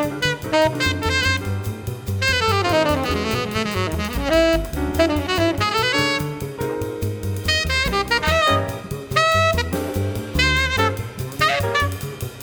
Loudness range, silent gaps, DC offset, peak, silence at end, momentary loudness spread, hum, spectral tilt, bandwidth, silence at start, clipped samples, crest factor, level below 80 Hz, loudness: 2 LU; none; under 0.1%; -4 dBFS; 0 s; 9 LU; none; -4.5 dB/octave; over 20 kHz; 0 s; under 0.1%; 18 dB; -34 dBFS; -20 LUFS